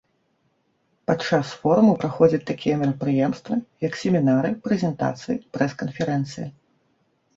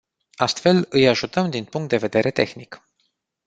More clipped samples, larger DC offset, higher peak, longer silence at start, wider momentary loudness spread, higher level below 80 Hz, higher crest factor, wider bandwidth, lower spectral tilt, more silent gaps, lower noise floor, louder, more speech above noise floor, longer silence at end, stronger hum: neither; neither; second, -4 dBFS vs 0 dBFS; first, 1.1 s vs 0.4 s; about the same, 10 LU vs 8 LU; about the same, -60 dBFS vs -58 dBFS; about the same, 20 dB vs 22 dB; second, 7.8 kHz vs 9 kHz; first, -7.5 dB/octave vs -5.5 dB/octave; neither; about the same, -68 dBFS vs -71 dBFS; second, -23 LUFS vs -20 LUFS; second, 47 dB vs 51 dB; first, 0.85 s vs 0.7 s; neither